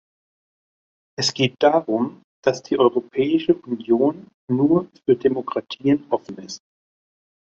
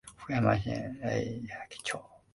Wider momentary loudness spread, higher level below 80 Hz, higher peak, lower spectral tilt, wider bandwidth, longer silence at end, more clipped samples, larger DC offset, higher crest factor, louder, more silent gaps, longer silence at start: about the same, 12 LU vs 12 LU; second, -64 dBFS vs -54 dBFS; first, -2 dBFS vs -14 dBFS; about the same, -5.5 dB/octave vs -6 dB/octave; second, 8 kHz vs 11.5 kHz; first, 1 s vs 0.15 s; neither; neither; about the same, 20 dB vs 20 dB; first, -21 LUFS vs -33 LUFS; first, 2.24-2.43 s, 4.34-4.48 s vs none; first, 1.2 s vs 0.05 s